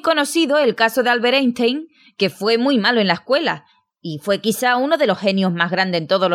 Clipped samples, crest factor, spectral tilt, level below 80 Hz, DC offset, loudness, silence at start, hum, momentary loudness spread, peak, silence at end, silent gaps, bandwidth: under 0.1%; 16 dB; -4.5 dB/octave; -70 dBFS; under 0.1%; -17 LUFS; 0.05 s; none; 7 LU; 0 dBFS; 0 s; none; 17 kHz